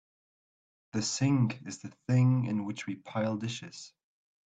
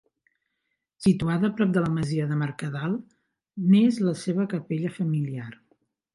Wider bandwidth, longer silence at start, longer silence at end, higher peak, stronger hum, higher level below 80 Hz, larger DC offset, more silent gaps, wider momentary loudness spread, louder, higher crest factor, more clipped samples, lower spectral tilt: second, 9 kHz vs 11.5 kHz; about the same, 0.95 s vs 1 s; about the same, 0.6 s vs 0.6 s; second, -16 dBFS vs -10 dBFS; neither; second, -70 dBFS vs -58 dBFS; neither; neither; first, 16 LU vs 12 LU; second, -31 LUFS vs -25 LUFS; about the same, 16 dB vs 16 dB; neither; second, -6 dB/octave vs -7.5 dB/octave